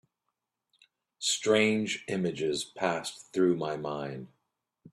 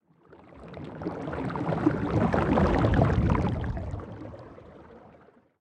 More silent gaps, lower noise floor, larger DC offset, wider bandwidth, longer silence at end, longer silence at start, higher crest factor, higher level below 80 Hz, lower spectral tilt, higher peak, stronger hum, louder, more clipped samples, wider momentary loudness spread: neither; first, -85 dBFS vs -57 dBFS; neither; first, 13.5 kHz vs 9.2 kHz; second, 0.05 s vs 0.5 s; first, 1.2 s vs 0.55 s; about the same, 22 dB vs 20 dB; second, -72 dBFS vs -38 dBFS; second, -4 dB/octave vs -9 dB/octave; about the same, -10 dBFS vs -8 dBFS; neither; second, -30 LUFS vs -27 LUFS; neither; second, 11 LU vs 22 LU